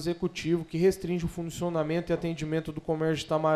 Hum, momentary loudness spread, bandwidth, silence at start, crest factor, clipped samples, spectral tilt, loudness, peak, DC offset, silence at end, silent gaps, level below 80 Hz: none; 6 LU; 14.5 kHz; 0 s; 16 dB; under 0.1%; -6.5 dB/octave; -30 LUFS; -14 dBFS; under 0.1%; 0 s; none; -52 dBFS